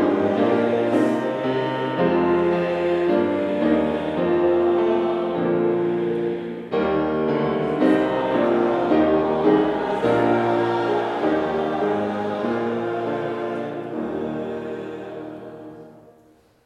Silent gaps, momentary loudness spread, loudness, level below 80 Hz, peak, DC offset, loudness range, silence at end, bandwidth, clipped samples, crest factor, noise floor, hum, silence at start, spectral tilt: none; 10 LU; -21 LUFS; -56 dBFS; -6 dBFS; under 0.1%; 7 LU; 0.7 s; 8.6 kHz; under 0.1%; 16 dB; -55 dBFS; none; 0 s; -8 dB/octave